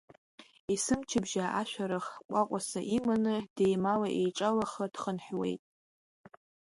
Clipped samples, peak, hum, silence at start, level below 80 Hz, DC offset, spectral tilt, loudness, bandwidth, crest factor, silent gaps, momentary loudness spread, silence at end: under 0.1%; -16 dBFS; none; 0.4 s; -66 dBFS; under 0.1%; -5 dB/octave; -32 LUFS; 11.5 kHz; 18 dB; 0.60-0.68 s, 2.25-2.29 s, 3.50-3.56 s; 7 LU; 1.1 s